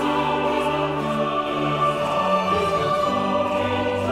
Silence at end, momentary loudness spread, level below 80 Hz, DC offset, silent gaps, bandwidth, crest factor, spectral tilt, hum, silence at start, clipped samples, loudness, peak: 0 s; 3 LU; -48 dBFS; under 0.1%; none; 15.5 kHz; 14 dB; -5.5 dB/octave; none; 0 s; under 0.1%; -22 LUFS; -8 dBFS